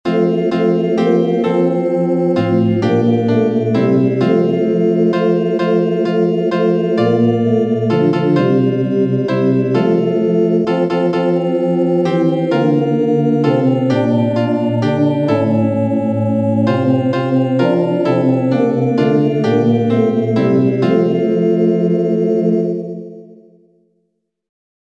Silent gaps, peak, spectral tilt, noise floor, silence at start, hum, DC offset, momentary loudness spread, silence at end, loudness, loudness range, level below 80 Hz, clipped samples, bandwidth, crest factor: none; -2 dBFS; -9 dB/octave; -68 dBFS; 0.05 s; none; under 0.1%; 2 LU; 1.65 s; -14 LUFS; 1 LU; -62 dBFS; under 0.1%; 8 kHz; 12 dB